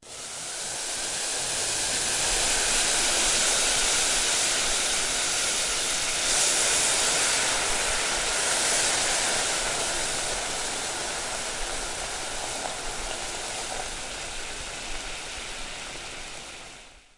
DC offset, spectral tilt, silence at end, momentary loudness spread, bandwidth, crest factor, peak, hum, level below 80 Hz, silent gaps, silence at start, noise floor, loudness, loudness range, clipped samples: under 0.1%; 0.5 dB/octave; 0.2 s; 13 LU; 11.5 kHz; 18 dB; -10 dBFS; none; -44 dBFS; none; 0 s; -47 dBFS; -24 LUFS; 11 LU; under 0.1%